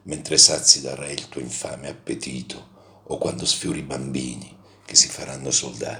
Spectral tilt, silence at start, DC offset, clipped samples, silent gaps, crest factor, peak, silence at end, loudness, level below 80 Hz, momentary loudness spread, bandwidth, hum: -1.5 dB/octave; 0.05 s; under 0.1%; under 0.1%; none; 24 dB; 0 dBFS; 0 s; -19 LUFS; -54 dBFS; 20 LU; over 20 kHz; none